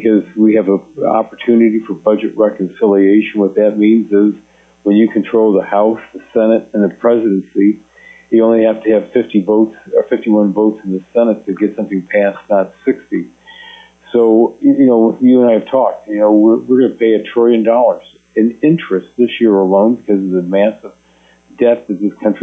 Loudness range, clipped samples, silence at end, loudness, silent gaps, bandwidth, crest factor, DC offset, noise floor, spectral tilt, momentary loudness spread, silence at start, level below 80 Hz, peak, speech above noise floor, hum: 4 LU; under 0.1%; 0 s; -12 LUFS; none; 3.8 kHz; 12 dB; under 0.1%; -49 dBFS; -9 dB/octave; 7 LU; 0 s; -60 dBFS; 0 dBFS; 37 dB; none